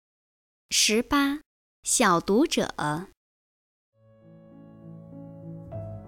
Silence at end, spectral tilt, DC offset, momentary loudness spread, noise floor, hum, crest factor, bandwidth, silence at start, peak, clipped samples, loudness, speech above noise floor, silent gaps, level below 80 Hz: 0 s; -3 dB/octave; under 0.1%; 23 LU; -53 dBFS; none; 20 dB; 17 kHz; 0.7 s; -10 dBFS; under 0.1%; -24 LUFS; 30 dB; 1.46-1.83 s, 3.17-3.92 s; -54 dBFS